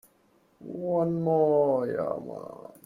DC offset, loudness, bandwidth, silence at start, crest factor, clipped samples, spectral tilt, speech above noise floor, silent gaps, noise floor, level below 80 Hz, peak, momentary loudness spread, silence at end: under 0.1%; -27 LUFS; 14.5 kHz; 0.6 s; 16 dB; under 0.1%; -10 dB/octave; 38 dB; none; -65 dBFS; -68 dBFS; -12 dBFS; 18 LU; 0.15 s